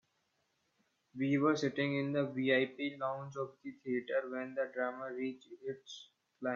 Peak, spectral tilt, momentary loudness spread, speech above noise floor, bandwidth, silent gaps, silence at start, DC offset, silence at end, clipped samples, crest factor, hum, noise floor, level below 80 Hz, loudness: -18 dBFS; -6 dB/octave; 15 LU; 43 dB; 7.4 kHz; none; 1.15 s; under 0.1%; 0 s; under 0.1%; 20 dB; none; -80 dBFS; -84 dBFS; -36 LUFS